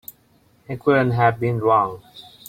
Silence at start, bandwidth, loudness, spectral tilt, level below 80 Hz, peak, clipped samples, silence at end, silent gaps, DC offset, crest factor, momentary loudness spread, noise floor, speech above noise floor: 0.7 s; 16 kHz; -19 LUFS; -7.5 dB/octave; -56 dBFS; -4 dBFS; under 0.1%; 0.3 s; none; under 0.1%; 18 dB; 18 LU; -58 dBFS; 39 dB